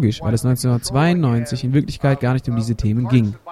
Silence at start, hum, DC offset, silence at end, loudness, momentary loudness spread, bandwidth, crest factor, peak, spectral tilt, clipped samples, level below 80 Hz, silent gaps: 0 s; none; under 0.1%; 0 s; -19 LUFS; 4 LU; 13.5 kHz; 16 dB; -2 dBFS; -7 dB/octave; under 0.1%; -38 dBFS; none